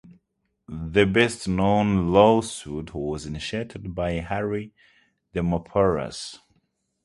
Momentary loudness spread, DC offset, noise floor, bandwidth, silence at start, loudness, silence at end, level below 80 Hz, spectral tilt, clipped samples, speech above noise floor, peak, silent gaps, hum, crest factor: 15 LU; under 0.1%; -75 dBFS; 11.5 kHz; 0.05 s; -24 LUFS; 0.7 s; -44 dBFS; -6 dB/octave; under 0.1%; 52 dB; -2 dBFS; none; none; 24 dB